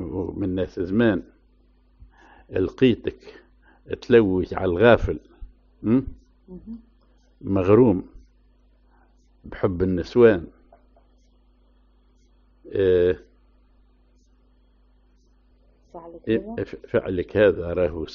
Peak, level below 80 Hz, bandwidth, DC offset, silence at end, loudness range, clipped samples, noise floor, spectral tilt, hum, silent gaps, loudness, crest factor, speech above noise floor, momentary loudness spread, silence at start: -2 dBFS; -44 dBFS; 6.6 kHz; under 0.1%; 0 s; 6 LU; under 0.1%; -58 dBFS; -6.5 dB/octave; none; none; -22 LUFS; 22 dB; 37 dB; 22 LU; 0 s